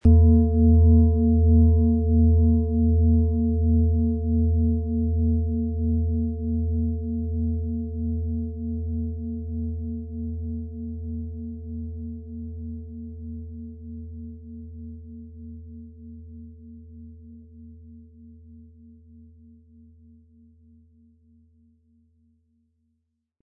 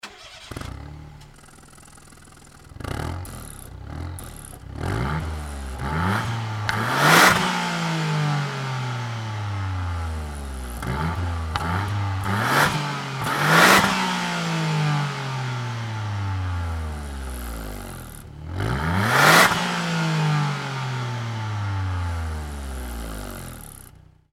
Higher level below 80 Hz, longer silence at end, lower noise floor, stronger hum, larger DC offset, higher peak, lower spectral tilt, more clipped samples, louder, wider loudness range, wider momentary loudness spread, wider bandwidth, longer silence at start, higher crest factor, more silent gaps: first, -32 dBFS vs -38 dBFS; first, 4.8 s vs 0.45 s; first, -75 dBFS vs -49 dBFS; neither; neither; second, -6 dBFS vs 0 dBFS; first, -15.5 dB/octave vs -4 dB/octave; neither; about the same, -23 LUFS vs -22 LUFS; first, 23 LU vs 13 LU; first, 24 LU vs 21 LU; second, 1 kHz vs 17 kHz; about the same, 0.05 s vs 0.05 s; second, 18 dB vs 24 dB; neither